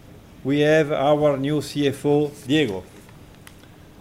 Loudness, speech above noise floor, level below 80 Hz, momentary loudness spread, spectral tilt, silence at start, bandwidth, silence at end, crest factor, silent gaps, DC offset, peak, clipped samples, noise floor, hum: -21 LUFS; 26 dB; -54 dBFS; 7 LU; -6 dB/octave; 0.15 s; 16 kHz; 1 s; 16 dB; none; under 0.1%; -6 dBFS; under 0.1%; -46 dBFS; none